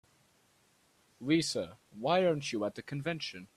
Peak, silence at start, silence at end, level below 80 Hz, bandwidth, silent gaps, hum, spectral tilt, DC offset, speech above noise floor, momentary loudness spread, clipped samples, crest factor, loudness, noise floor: -14 dBFS; 1.2 s; 0.1 s; -72 dBFS; 13.5 kHz; none; none; -5 dB/octave; under 0.1%; 37 dB; 10 LU; under 0.1%; 20 dB; -33 LUFS; -69 dBFS